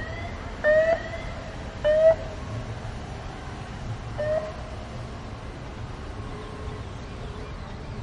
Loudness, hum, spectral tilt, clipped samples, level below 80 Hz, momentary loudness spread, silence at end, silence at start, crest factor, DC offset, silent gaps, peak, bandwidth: -29 LUFS; none; -6 dB/octave; under 0.1%; -40 dBFS; 16 LU; 0 s; 0 s; 20 dB; under 0.1%; none; -8 dBFS; 10.5 kHz